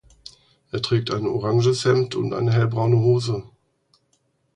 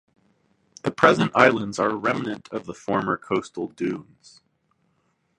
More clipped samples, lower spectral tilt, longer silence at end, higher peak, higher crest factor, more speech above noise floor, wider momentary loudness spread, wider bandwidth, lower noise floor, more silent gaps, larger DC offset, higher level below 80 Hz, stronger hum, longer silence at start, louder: neither; about the same, -6.5 dB/octave vs -5.5 dB/octave; second, 1.15 s vs 1.35 s; second, -6 dBFS vs 0 dBFS; second, 16 dB vs 24 dB; about the same, 47 dB vs 46 dB; second, 9 LU vs 15 LU; about the same, 10 kHz vs 11 kHz; about the same, -67 dBFS vs -69 dBFS; neither; neither; first, -54 dBFS vs -62 dBFS; neither; about the same, 0.75 s vs 0.85 s; about the same, -21 LUFS vs -23 LUFS